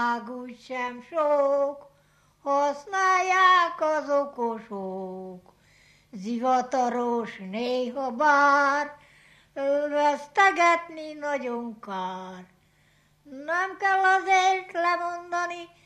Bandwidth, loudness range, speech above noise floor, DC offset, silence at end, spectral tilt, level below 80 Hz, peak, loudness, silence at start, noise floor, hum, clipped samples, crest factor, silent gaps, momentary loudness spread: 12 kHz; 6 LU; 38 dB; under 0.1%; 0.2 s; -3.5 dB/octave; -72 dBFS; -8 dBFS; -25 LUFS; 0 s; -63 dBFS; none; under 0.1%; 18 dB; none; 16 LU